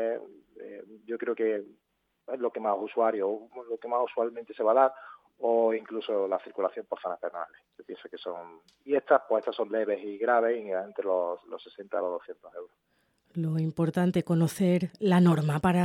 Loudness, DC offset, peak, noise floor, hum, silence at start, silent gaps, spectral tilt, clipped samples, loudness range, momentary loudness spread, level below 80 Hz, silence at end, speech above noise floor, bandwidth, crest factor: -29 LUFS; under 0.1%; -8 dBFS; -70 dBFS; none; 0 s; none; -7.5 dB/octave; under 0.1%; 5 LU; 18 LU; -66 dBFS; 0 s; 42 dB; 13.5 kHz; 20 dB